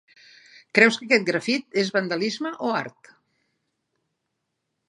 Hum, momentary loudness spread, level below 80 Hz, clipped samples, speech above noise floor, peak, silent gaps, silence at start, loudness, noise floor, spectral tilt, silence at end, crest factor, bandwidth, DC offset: none; 10 LU; -78 dBFS; under 0.1%; 56 dB; 0 dBFS; none; 0.75 s; -22 LUFS; -79 dBFS; -4 dB/octave; 2 s; 24 dB; 11.5 kHz; under 0.1%